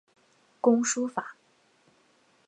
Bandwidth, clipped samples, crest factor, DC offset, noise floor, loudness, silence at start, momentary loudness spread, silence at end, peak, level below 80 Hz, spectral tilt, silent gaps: 9 kHz; under 0.1%; 22 dB; under 0.1%; -65 dBFS; -27 LUFS; 0.65 s; 14 LU; 1.15 s; -10 dBFS; -86 dBFS; -3.5 dB/octave; none